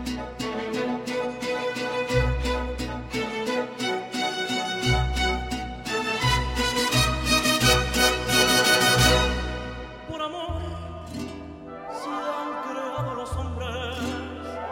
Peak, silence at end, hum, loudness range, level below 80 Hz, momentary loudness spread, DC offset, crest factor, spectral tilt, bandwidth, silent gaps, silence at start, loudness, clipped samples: -4 dBFS; 0 s; none; 12 LU; -34 dBFS; 16 LU; under 0.1%; 22 dB; -3.5 dB/octave; 17 kHz; none; 0 s; -24 LUFS; under 0.1%